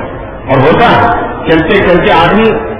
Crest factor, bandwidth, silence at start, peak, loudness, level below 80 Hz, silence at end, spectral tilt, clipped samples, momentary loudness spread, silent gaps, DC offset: 8 dB; 5.4 kHz; 0 s; 0 dBFS; -7 LUFS; -26 dBFS; 0 s; -8.5 dB/octave; 2%; 7 LU; none; under 0.1%